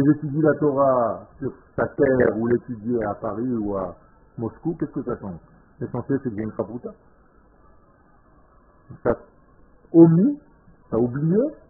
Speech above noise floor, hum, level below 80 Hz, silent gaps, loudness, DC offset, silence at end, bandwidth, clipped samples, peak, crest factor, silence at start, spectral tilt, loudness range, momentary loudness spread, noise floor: 33 dB; none; -52 dBFS; none; -22 LUFS; under 0.1%; 0.15 s; 2.3 kHz; under 0.1%; -2 dBFS; 22 dB; 0 s; -14.5 dB/octave; 11 LU; 15 LU; -55 dBFS